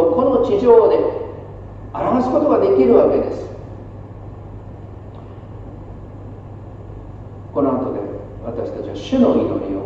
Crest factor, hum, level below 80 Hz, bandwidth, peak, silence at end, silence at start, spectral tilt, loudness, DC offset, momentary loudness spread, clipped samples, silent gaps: 18 dB; none; -40 dBFS; 7.2 kHz; 0 dBFS; 0 s; 0 s; -8.5 dB/octave; -16 LUFS; under 0.1%; 23 LU; under 0.1%; none